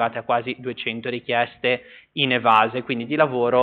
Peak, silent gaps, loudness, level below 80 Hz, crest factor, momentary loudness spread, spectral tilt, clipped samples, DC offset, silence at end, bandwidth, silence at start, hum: -4 dBFS; none; -22 LUFS; -66 dBFS; 18 dB; 11 LU; -2.5 dB/octave; under 0.1%; under 0.1%; 0 s; 4.7 kHz; 0 s; none